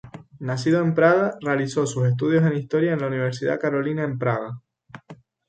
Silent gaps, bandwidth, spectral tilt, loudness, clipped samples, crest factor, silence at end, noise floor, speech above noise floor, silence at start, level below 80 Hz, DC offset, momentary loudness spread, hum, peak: none; 9.2 kHz; -7 dB/octave; -22 LUFS; under 0.1%; 18 dB; 0.35 s; -47 dBFS; 26 dB; 0.05 s; -62 dBFS; under 0.1%; 9 LU; none; -4 dBFS